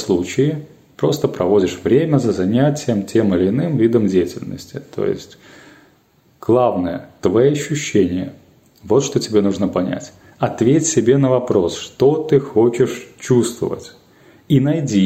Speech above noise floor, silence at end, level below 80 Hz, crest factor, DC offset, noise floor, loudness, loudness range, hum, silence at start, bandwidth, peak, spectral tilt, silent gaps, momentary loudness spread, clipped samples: 39 dB; 0 s; -54 dBFS; 16 dB; under 0.1%; -55 dBFS; -17 LUFS; 4 LU; none; 0 s; 15.5 kHz; -2 dBFS; -6 dB/octave; none; 10 LU; under 0.1%